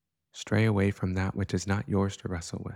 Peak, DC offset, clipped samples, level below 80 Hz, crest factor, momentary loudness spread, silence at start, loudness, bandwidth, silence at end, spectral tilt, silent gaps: -14 dBFS; under 0.1%; under 0.1%; -54 dBFS; 16 dB; 10 LU; 0.35 s; -29 LUFS; 12 kHz; 0 s; -6.5 dB/octave; none